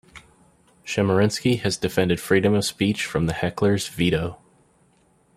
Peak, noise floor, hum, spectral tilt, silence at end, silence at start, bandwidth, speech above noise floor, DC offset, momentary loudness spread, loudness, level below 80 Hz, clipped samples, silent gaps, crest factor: -4 dBFS; -61 dBFS; none; -5.5 dB/octave; 1 s; 0.15 s; 16 kHz; 39 dB; under 0.1%; 6 LU; -22 LUFS; -50 dBFS; under 0.1%; none; 18 dB